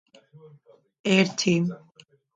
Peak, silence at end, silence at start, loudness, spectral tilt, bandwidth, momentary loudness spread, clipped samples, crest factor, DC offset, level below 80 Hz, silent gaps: -6 dBFS; 0.6 s; 1.05 s; -23 LUFS; -5 dB/octave; 9.2 kHz; 11 LU; under 0.1%; 20 dB; under 0.1%; -70 dBFS; none